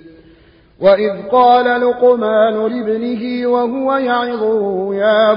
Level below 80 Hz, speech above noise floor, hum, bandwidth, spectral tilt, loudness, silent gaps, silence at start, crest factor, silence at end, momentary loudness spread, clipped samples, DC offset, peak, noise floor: -54 dBFS; 33 dB; none; 5.4 kHz; -10.5 dB/octave; -14 LUFS; none; 0.05 s; 14 dB; 0 s; 8 LU; under 0.1%; under 0.1%; 0 dBFS; -47 dBFS